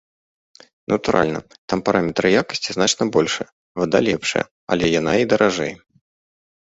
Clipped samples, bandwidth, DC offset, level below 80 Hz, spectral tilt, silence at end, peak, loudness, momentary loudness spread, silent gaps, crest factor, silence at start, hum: under 0.1%; 8 kHz; under 0.1%; -50 dBFS; -4 dB/octave; 0.9 s; -2 dBFS; -19 LUFS; 9 LU; 1.58-1.68 s, 3.52-3.75 s, 4.51-4.67 s; 18 dB; 0.9 s; none